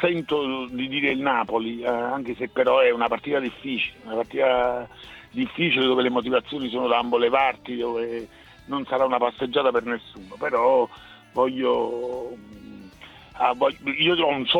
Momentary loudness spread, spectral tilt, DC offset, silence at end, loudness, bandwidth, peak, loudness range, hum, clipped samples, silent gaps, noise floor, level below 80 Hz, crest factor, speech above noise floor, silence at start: 13 LU; -6 dB/octave; under 0.1%; 0 s; -23 LUFS; 7.4 kHz; -6 dBFS; 3 LU; none; under 0.1%; none; -46 dBFS; -58 dBFS; 18 dB; 23 dB; 0 s